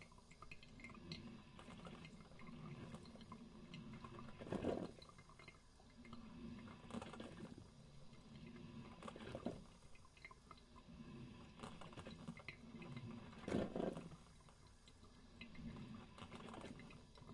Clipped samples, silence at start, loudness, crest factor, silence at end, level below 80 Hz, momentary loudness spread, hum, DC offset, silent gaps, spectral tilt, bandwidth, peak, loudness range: under 0.1%; 0 s; -54 LUFS; 26 dB; 0 s; -68 dBFS; 17 LU; none; under 0.1%; none; -6 dB/octave; 11 kHz; -28 dBFS; 7 LU